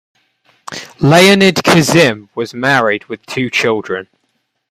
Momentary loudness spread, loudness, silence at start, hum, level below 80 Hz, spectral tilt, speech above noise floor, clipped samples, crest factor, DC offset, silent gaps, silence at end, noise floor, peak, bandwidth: 16 LU; -11 LUFS; 0.7 s; none; -50 dBFS; -4.5 dB/octave; 54 dB; under 0.1%; 14 dB; under 0.1%; none; 0.65 s; -66 dBFS; 0 dBFS; 15.5 kHz